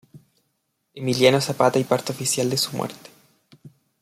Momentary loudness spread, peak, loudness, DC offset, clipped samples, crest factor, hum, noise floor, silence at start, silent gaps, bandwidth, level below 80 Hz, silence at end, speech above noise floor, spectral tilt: 12 LU; -4 dBFS; -21 LUFS; under 0.1%; under 0.1%; 20 dB; none; -73 dBFS; 0.15 s; none; 16 kHz; -64 dBFS; 0.35 s; 52 dB; -4 dB/octave